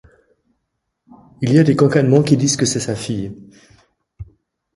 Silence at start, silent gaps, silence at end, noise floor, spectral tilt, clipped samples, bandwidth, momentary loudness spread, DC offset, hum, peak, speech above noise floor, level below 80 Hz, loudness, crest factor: 1.4 s; none; 0.5 s; -74 dBFS; -5.5 dB/octave; under 0.1%; 11.5 kHz; 12 LU; under 0.1%; none; 0 dBFS; 59 dB; -50 dBFS; -16 LUFS; 18 dB